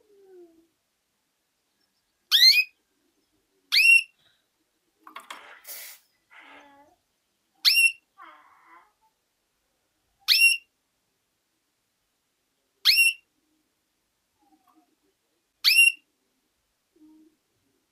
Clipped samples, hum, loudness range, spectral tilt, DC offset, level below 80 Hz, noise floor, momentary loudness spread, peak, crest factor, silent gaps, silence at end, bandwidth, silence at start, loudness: under 0.1%; none; 6 LU; 5.5 dB/octave; under 0.1%; -88 dBFS; -76 dBFS; 25 LU; -6 dBFS; 22 dB; none; 1.95 s; 16 kHz; 2.3 s; -18 LUFS